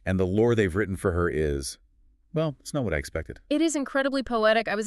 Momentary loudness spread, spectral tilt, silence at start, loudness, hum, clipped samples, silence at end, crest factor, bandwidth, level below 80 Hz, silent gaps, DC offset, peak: 11 LU; -5.5 dB/octave; 0.05 s; -26 LUFS; none; under 0.1%; 0 s; 16 dB; 13.5 kHz; -42 dBFS; none; under 0.1%; -10 dBFS